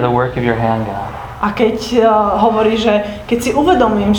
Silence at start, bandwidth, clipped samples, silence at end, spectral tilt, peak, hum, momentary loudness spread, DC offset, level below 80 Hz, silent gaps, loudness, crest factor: 0 s; 19.5 kHz; under 0.1%; 0 s; -6 dB/octave; 0 dBFS; none; 8 LU; under 0.1%; -36 dBFS; none; -14 LUFS; 14 dB